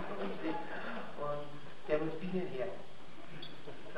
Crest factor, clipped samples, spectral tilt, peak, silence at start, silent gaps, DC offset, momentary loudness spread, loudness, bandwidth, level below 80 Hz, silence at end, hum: 22 dB; under 0.1%; -7 dB/octave; -18 dBFS; 0 s; none; 1%; 14 LU; -41 LUFS; 12.5 kHz; -68 dBFS; 0 s; none